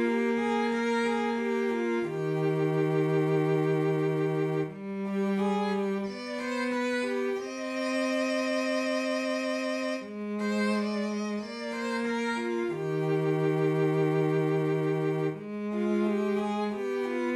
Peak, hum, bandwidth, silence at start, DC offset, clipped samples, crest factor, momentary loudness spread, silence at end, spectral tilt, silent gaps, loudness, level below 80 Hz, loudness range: -16 dBFS; none; 12.5 kHz; 0 s; under 0.1%; under 0.1%; 12 dB; 6 LU; 0 s; -6.5 dB/octave; none; -29 LUFS; -72 dBFS; 3 LU